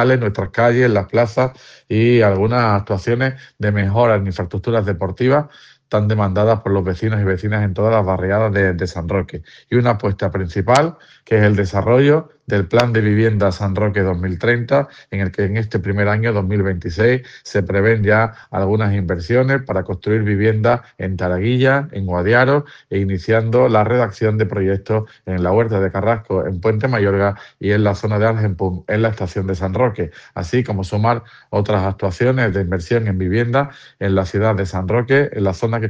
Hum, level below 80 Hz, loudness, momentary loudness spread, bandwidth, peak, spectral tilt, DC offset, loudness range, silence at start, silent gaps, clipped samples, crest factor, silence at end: none; -46 dBFS; -17 LUFS; 7 LU; 8.4 kHz; 0 dBFS; -8 dB/octave; under 0.1%; 3 LU; 0 s; none; under 0.1%; 16 dB; 0 s